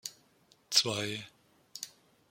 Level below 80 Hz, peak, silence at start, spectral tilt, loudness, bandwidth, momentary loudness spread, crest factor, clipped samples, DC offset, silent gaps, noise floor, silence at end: -80 dBFS; -8 dBFS; 0.05 s; -1.5 dB/octave; -30 LUFS; 16.5 kHz; 21 LU; 30 dB; under 0.1%; under 0.1%; none; -67 dBFS; 0.4 s